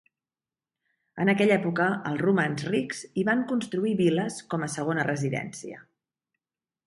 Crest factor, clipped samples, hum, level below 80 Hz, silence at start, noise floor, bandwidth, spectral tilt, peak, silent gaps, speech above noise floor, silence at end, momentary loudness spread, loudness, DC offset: 18 dB; under 0.1%; none; -70 dBFS; 1.15 s; under -90 dBFS; 11.5 kHz; -6 dB/octave; -10 dBFS; none; over 64 dB; 1.05 s; 9 LU; -26 LUFS; under 0.1%